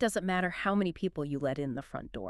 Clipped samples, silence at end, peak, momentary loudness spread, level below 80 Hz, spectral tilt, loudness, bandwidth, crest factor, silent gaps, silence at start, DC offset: under 0.1%; 0 s; -14 dBFS; 8 LU; -56 dBFS; -5.5 dB/octave; -33 LUFS; 13 kHz; 18 dB; none; 0 s; under 0.1%